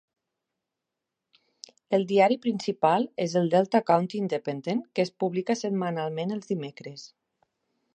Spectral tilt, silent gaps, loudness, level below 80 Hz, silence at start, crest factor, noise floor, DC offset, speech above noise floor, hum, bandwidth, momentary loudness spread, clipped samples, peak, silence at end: -6 dB/octave; none; -26 LUFS; -78 dBFS; 1.9 s; 20 dB; -86 dBFS; under 0.1%; 60 dB; none; 9.6 kHz; 10 LU; under 0.1%; -8 dBFS; 0.9 s